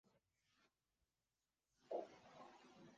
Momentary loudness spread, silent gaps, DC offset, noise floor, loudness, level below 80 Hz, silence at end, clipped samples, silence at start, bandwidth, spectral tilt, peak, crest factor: 13 LU; none; under 0.1%; under -90 dBFS; -55 LUFS; under -90 dBFS; 0 s; under 0.1%; 0.05 s; 7.4 kHz; -4 dB/octave; -36 dBFS; 24 dB